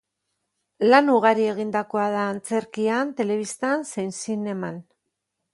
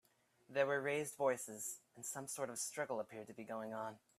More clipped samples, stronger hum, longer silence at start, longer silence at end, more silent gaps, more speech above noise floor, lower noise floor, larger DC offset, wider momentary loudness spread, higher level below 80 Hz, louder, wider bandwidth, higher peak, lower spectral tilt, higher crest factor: neither; neither; first, 0.8 s vs 0.5 s; first, 0.7 s vs 0.2 s; neither; first, 57 dB vs 26 dB; first, -79 dBFS vs -68 dBFS; neither; about the same, 12 LU vs 10 LU; first, -72 dBFS vs -88 dBFS; first, -23 LUFS vs -42 LUFS; second, 11.5 kHz vs 15.5 kHz; first, -2 dBFS vs -20 dBFS; first, -5 dB/octave vs -3 dB/octave; about the same, 22 dB vs 22 dB